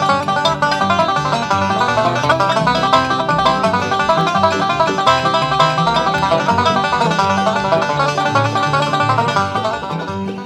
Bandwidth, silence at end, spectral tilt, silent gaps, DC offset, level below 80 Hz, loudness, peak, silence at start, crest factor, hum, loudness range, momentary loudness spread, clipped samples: 13.5 kHz; 0 s; -5 dB/octave; none; under 0.1%; -44 dBFS; -15 LUFS; 0 dBFS; 0 s; 16 dB; none; 1 LU; 3 LU; under 0.1%